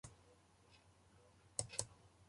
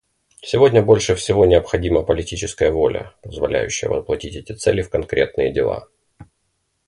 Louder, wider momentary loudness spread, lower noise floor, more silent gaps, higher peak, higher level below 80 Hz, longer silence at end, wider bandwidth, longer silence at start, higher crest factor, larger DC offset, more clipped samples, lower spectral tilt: second, -46 LUFS vs -18 LUFS; first, 26 LU vs 12 LU; about the same, -70 dBFS vs -70 dBFS; neither; second, -20 dBFS vs 0 dBFS; second, -72 dBFS vs -36 dBFS; second, 0 s vs 0.65 s; about the same, 11.5 kHz vs 11.5 kHz; second, 0.05 s vs 0.45 s; first, 34 dB vs 18 dB; neither; neither; second, -2 dB/octave vs -5 dB/octave